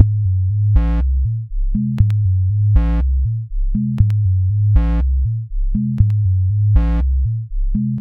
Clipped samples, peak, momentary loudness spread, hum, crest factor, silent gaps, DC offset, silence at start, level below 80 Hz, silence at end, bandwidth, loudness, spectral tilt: under 0.1%; 0 dBFS; 7 LU; none; 14 dB; none; under 0.1%; 0 s; -18 dBFS; 0 s; 3.5 kHz; -18 LUFS; -11 dB/octave